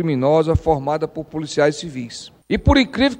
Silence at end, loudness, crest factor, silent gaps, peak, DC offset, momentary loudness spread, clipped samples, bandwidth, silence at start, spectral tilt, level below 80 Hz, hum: 0 s; -19 LUFS; 16 dB; none; -2 dBFS; under 0.1%; 14 LU; under 0.1%; 10 kHz; 0 s; -6 dB/octave; -30 dBFS; none